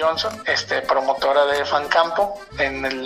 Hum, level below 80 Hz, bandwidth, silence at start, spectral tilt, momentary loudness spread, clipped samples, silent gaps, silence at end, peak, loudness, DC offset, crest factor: none; -48 dBFS; 15 kHz; 0 s; -3 dB/octave; 5 LU; under 0.1%; none; 0 s; -2 dBFS; -20 LUFS; under 0.1%; 18 dB